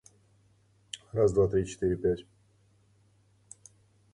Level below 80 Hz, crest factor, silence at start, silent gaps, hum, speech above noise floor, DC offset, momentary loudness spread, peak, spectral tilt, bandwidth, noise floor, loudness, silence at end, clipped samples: -52 dBFS; 18 dB; 0.95 s; none; none; 38 dB; under 0.1%; 26 LU; -14 dBFS; -6.5 dB/octave; 11 kHz; -65 dBFS; -29 LUFS; 1.95 s; under 0.1%